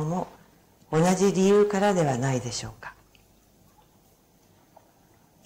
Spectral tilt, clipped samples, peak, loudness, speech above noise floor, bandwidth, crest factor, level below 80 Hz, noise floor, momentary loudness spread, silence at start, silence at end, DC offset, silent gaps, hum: -5.5 dB/octave; under 0.1%; -12 dBFS; -24 LUFS; 37 dB; 16 kHz; 14 dB; -58 dBFS; -60 dBFS; 20 LU; 0 s; 2.55 s; under 0.1%; none; none